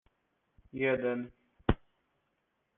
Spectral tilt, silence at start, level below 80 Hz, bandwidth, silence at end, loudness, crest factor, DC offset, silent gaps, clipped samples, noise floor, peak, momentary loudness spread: -5.5 dB/octave; 0.75 s; -46 dBFS; 4 kHz; 1.05 s; -34 LUFS; 28 dB; under 0.1%; none; under 0.1%; -80 dBFS; -10 dBFS; 14 LU